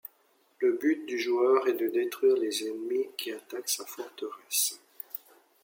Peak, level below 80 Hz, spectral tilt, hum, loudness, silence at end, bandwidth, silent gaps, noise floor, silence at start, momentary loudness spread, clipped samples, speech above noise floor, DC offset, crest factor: -12 dBFS; -88 dBFS; -1 dB/octave; none; -29 LUFS; 0.45 s; 17 kHz; none; -67 dBFS; 0.05 s; 15 LU; under 0.1%; 38 dB; under 0.1%; 18 dB